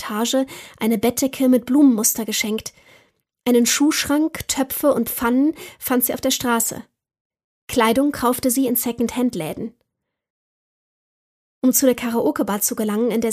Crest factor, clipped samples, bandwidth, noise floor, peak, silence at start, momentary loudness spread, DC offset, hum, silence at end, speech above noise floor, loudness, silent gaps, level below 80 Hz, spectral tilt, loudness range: 16 dB; under 0.1%; 15.5 kHz; -74 dBFS; -4 dBFS; 0 s; 9 LU; under 0.1%; none; 0 s; 55 dB; -19 LUFS; 7.20-7.30 s, 7.44-7.67 s, 10.30-11.62 s; -54 dBFS; -3 dB/octave; 5 LU